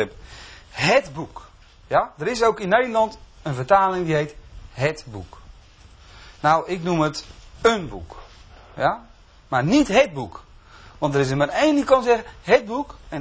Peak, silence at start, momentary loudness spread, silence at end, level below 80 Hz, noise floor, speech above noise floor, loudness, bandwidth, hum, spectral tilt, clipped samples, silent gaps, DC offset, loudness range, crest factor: -2 dBFS; 0 s; 18 LU; 0 s; -46 dBFS; -48 dBFS; 27 dB; -21 LUFS; 8 kHz; none; -5.5 dB/octave; under 0.1%; none; under 0.1%; 4 LU; 20 dB